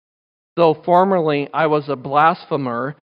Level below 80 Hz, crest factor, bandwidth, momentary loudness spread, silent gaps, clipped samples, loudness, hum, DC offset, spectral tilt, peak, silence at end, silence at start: -70 dBFS; 16 dB; 5.4 kHz; 8 LU; none; under 0.1%; -17 LUFS; none; under 0.1%; -8.5 dB/octave; -2 dBFS; 0.15 s; 0.55 s